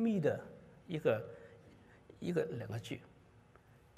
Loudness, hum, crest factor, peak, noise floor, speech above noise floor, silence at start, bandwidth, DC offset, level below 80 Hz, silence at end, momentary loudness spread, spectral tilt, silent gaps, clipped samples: -39 LUFS; none; 20 dB; -20 dBFS; -64 dBFS; 27 dB; 0 s; 14 kHz; under 0.1%; -72 dBFS; 0.9 s; 21 LU; -7.5 dB/octave; none; under 0.1%